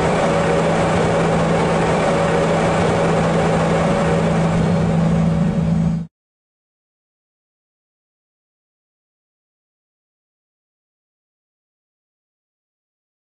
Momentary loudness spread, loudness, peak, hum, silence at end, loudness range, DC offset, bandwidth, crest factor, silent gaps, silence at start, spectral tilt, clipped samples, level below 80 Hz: 1 LU; -17 LUFS; -8 dBFS; none; 7.2 s; 8 LU; 0.2%; 10 kHz; 12 dB; none; 0 s; -6.5 dB/octave; under 0.1%; -38 dBFS